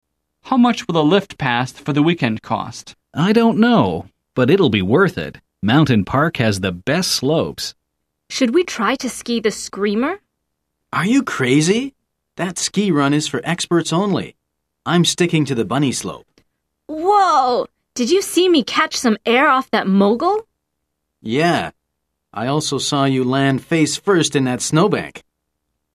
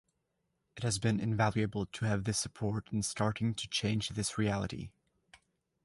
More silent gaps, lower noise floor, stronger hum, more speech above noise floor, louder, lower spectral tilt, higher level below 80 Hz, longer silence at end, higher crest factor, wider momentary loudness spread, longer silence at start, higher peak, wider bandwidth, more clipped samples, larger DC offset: neither; second, -75 dBFS vs -81 dBFS; neither; first, 59 dB vs 48 dB; first, -17 LUFS vs -34 LUFS; about the same, -5 dB/octave vs -4.5 dB/octave; about the same, -52 dBFS vs -56 dBFS; second, 0.75 s vs 0.95 s; about the same, 16 dB vs 20 dB; first, 12 LU vs 6 LU; second, 0.45 s vs 0.75 s; first, -2 dBFS vs -16 dBFS; first, 14 kHz vs 11.5 kHz; neither; neither